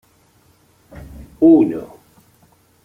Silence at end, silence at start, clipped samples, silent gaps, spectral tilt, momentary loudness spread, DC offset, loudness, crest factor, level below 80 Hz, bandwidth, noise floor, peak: 1 s; 1.2 s; under 0.1%; none; -9.5 dB/octave; 27 LU; under 0.1%; -14 LUFS; 18 dB; -48 dBFS; 3.3 kHz; -55 dBFS; -2 dBFS